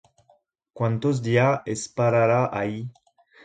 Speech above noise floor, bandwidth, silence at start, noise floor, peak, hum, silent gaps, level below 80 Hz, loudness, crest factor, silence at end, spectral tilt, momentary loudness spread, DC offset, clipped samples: 41 dB; 9.4 kHz; 0.75 s; -63 dBFS; -6 dBFS; none; none; -60 dBFS; -23 LUFS; 18 dB; 0.55 s; -6.5 dB/octave; 10 LU; under 0.1%; under 0.1%